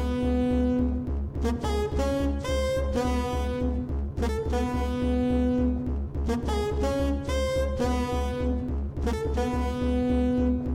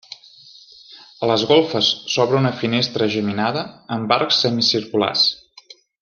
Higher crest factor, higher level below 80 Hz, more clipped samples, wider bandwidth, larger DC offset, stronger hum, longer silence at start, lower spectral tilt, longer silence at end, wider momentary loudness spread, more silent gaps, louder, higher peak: second, 12 dB vs 18 dB; first, -30 dBFS vs -62 dBFS; neither; first, 13.5 kHz vs 7.2 kHz; neither; neither; second, 0 s vs 0.9 s; first, -7 dB/octave vs -4.5 dB/octave; second, 0 s vs 0.65 s; second, 5 LU vs 12 LU; neither; second, -27 LUFS vs -18 LUFS; second, -14 dBFS vs -2 dBFS